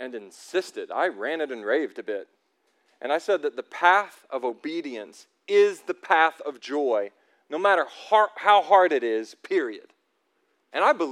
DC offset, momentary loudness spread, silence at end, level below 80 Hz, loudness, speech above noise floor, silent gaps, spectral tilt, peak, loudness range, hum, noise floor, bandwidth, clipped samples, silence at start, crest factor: under 0.1%; 16 LU; 0 s; under -90 dBFS; -24 LUFS; 48 dB; none; -3 dB/octave; -4 dBFS; 6 LU; none; -72 dBFS; 12.5 kHz; under 0.1%; 0 s; 20 dB